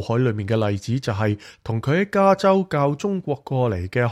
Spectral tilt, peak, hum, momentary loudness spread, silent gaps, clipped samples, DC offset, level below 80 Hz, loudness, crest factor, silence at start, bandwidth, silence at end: -7.5 dB/octave; -4 dBFS; none; 8 LU; none; under 0.1%; under 0.1%; -52 dBFS; -21 LUFS; 16 dB; 0 s; 12.5 kHz; 0 s